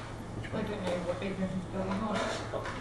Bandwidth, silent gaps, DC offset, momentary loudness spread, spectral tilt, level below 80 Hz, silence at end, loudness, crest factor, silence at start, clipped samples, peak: 12 kHz; none; under 0.1%; 5 LU; -6 dB/octave; -50 dBFS; 0 s; -35 LUFS; 14 dB; 0 s; under 0.1%; -20 dBFS